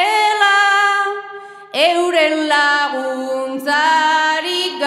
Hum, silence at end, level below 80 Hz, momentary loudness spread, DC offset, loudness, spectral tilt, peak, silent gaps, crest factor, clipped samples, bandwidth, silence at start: none; 0 s; -76 dBFS; 10 LU; under 0.1%; -15 LUFS; -0.5 dB/octave; 0 dBFS; none; 16 dB; under 0.1%; 15.5 kHz; 0 s